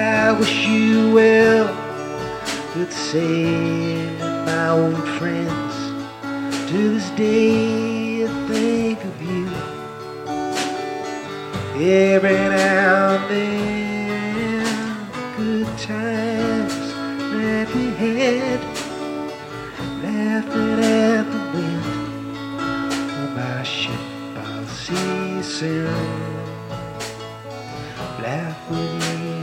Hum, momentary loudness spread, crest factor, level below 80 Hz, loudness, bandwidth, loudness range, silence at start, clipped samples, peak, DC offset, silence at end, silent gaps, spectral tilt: none; 14 LU; 18 dB; -52 dBFS; -21 LUFS; 16 kHz; 8 LU; 0 s; under 0.1%; -4 dBFS; under 0.1%; 0 s; none; -5.5 dB/octave